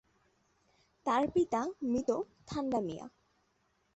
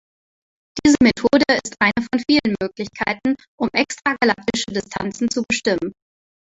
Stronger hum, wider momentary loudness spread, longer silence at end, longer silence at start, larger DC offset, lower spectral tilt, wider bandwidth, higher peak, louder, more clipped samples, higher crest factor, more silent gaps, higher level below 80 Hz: neither; about the same, 11 LU vs 10 LU; first, 0.85 s vs 0.65 s; first, 1.05 s vs 0.75 s; neither; first, -6 dB/octave vs -4 dB/octave; about the same, 8.2 kHz vs 8.2 kHz; second, -18 dBFS vs -2 dBFS; second, -34 LUFS vs -19 LUFS; neither; about the same, 18 dB vs 18 dB; second, none vs 3.48-3.58 s; second, -64 dBFS vs -50 dBFS